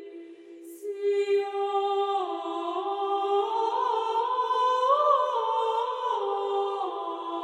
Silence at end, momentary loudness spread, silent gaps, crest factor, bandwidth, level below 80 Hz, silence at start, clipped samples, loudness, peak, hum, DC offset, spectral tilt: 0 s; 10 LU; none; 16 dB; 13 kHz; under -90 dBFS; 0 s; under 0.1%; -27 LUFS; -12 dBFS; none; under 0.1%; -2 dB/octave